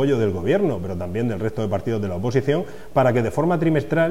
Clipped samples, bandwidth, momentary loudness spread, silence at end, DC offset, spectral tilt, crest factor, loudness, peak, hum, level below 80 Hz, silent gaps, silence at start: under 0.1%; 16 kHz; 6 LU; 0 s; 2%; -8 dB/octave; 16 dB; -22 LUFS; -6 dBFS; none; -48 dBFS; none; 0 s